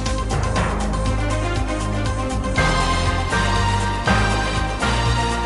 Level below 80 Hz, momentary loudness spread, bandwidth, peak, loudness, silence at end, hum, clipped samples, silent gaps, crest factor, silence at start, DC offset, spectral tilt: -24 dBFS; 5 LU; 11.5 kHz; -4 dBFS; -20 LUFS; 0 s; none; under 0.1%; none; 14 dB; 0 s; under 0.1%; -5 dB/octave